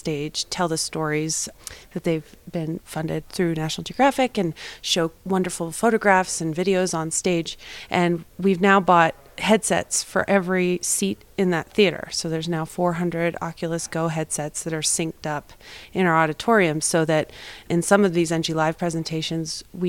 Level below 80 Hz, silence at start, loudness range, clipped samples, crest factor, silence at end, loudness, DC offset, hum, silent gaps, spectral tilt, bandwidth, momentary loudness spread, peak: -52 dBFS; 0.05 s; 5 LU; under 0.1%; 20 dB; 0 s; -22 LUFS; under 0.1%; none; none; -4 dB/octave; 17 kHz; 11 LU; -2 dBFS